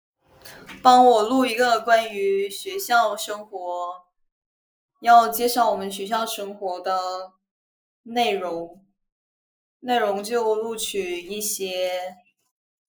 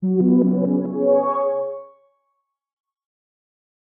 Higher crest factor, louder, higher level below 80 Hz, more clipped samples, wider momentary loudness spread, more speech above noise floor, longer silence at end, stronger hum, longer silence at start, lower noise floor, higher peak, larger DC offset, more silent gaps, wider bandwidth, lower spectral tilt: first, 22 dB vs 16 dB; second, -22 LUFS vs -19 LUFS; first, -68 dBFS vs -76 dBFS; neither; first, 15 LU vs 11 LU; second, 25 dB vs 57 dB; second, 0.75 s vs 2.15 s; neither; first, 0.45 s vs 0 s; second, -47 dBFS vs -74 dBFS; first, 0 dBFS vs -6 dBFS; neither; first, 4.32-4.89 s, 7.51-8.04 s, 9.12-9.80 s vs none; first, over 20 kHz vs 2.4 kHz; second, -2.5 dB/octave vs -13 dB/octave